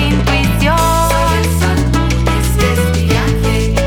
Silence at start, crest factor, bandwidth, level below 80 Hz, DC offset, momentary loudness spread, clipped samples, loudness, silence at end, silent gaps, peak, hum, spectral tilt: 0 s; 10 dB; 19 kHz; -18 dBFS; under 0.1%; 2 LU; under 0.1%; -13 LUFS; 0 s; none; -2 dBFS; none; -5.5 dB/octave